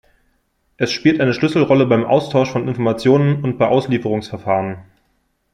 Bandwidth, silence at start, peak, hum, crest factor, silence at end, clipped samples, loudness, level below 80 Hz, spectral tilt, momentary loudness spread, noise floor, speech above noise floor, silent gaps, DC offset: 10 kHz; 0.8 s; -2 dBFS; none; 16 dB; 0.7 s; under 0.1%; -16 LUFS; -54 dBFS; -7 dB/octave; 8 LU; -65 dBFS; 49 dB; none; under 0.1%